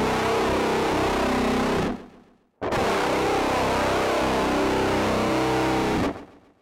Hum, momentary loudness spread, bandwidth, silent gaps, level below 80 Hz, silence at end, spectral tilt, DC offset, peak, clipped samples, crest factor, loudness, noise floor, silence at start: none; 4 LU; 16 kHz; none; -40 dBFS; 0.35 s; -5 dB/octave; under 0.1%; -14 dBFS; under 0.1%; 10 dB; -23 LUFS; -54 dBFS; 0 s